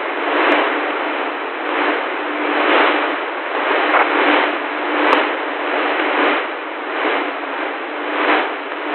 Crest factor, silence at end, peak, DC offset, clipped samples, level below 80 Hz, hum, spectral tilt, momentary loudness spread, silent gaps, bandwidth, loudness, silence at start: 18 dB; 0 s; 0 dBFS; under 0.1%; under 0.1%; -78 dBFS; none; 3 dB/octave; 9 LU; none; 4.3 kHz; -17 LUFS; 0 s